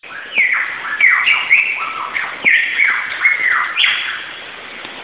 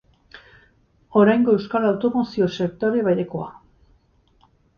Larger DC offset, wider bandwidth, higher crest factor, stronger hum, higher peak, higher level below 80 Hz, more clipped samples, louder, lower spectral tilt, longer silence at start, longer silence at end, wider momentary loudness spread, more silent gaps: first, 0.2% vs under 0.1%; second, 4 kHz vs 6.8 kHz; about the same, 16 dB vs 18 dB; neither; first, 0 dBFS vs -4 dBFS; about the same, -62 dBFS vs -58 dBFS; neither; first, -13 LUFS vs -20 LUFS; second, -2.5 dB/octave vs -8 dB/octave; second, 0.05 s vs 0.35 s; second, 0 s vs 1.25 s; first, 16 LU vs 10 LU; neither